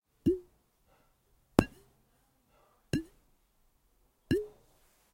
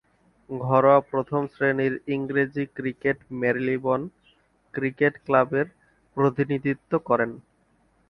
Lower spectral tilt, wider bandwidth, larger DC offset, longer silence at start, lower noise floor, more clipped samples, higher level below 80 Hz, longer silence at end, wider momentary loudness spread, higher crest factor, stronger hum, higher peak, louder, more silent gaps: second, -7 dB/octave vs -9.5 dB/octave; first, 16.5 kHz vs 5.8 kHz; neither; second, 0.25 s vs 0.5 s; first, -71 dBFS vs -65 dBFS; neither; first, -54 dBFS vs -62 dBFS; about the same, 0.65 s vs 0.7 s; first, 13 LU vs 10 LU; first, 36 dB vs 20 dB; neither; first, 0 dBFS vs -4 dBFS; second, -34 LUFS vs -24 LUFS; neither